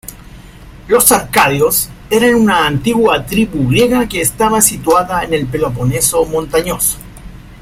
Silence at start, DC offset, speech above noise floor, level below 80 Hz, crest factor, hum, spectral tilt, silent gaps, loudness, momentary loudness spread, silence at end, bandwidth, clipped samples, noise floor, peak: 0.05 s; under 0.1%; 23 dB; -34 dBFS; 14 dB; none; -4 dB/octave; none; -12 LUFS; 6 LU; 0.05 s; 16.5 kHz; under 0.1%; -35 dBFS; 0 dBFS